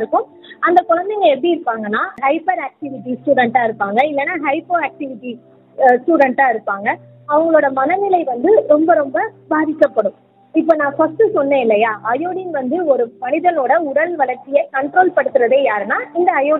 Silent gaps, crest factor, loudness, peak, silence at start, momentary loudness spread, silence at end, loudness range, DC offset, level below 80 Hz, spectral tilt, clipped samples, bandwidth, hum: none; 16 dB; -16 LUFS; 0 dBFS; 0 s; 8 LU; 0 s; 3 LU; under 0.1%; -66 dBFS; -7.5 dB/octave; under 0.1%; 4.9 kHz; none